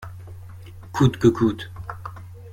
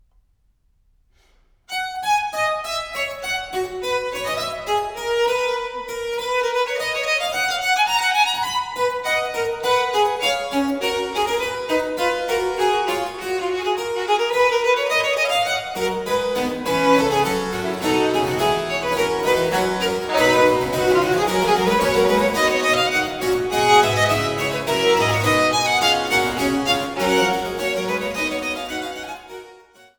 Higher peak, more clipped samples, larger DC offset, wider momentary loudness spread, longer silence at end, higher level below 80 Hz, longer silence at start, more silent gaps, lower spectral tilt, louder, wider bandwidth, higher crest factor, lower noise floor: about the same, -4 dBFS vs -2 dBFS; neither; neither; first, 23 LU vs 8 LU; second, 0 s vs 0.45 s; about the same, -46 dBFS vs -48 dBFS; second, 0 s vs 1.7 s; neither; first, -7.5 dB/octave vs -3.5 dB/octave; about the same, -21 LUFS vs -20 LUFS; second, 16 kHz vs over 20 kHz; about the same, 20 dB vs 18 dB; second, -40 dBFS vs -62 dBFS